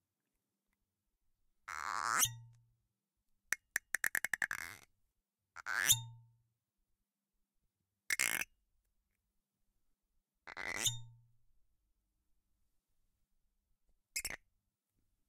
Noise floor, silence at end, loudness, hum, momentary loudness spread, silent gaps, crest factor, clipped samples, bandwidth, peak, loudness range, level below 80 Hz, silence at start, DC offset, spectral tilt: -89 dBFS; 0.95 s; -36 LUFS; none; 19 LU; none; 32 dB; under 0.1%; 17 kHz; -12 dBFS; 8 LU; -72 dBFS; 1.7 s; under 0.1%; 0.5 dB/octave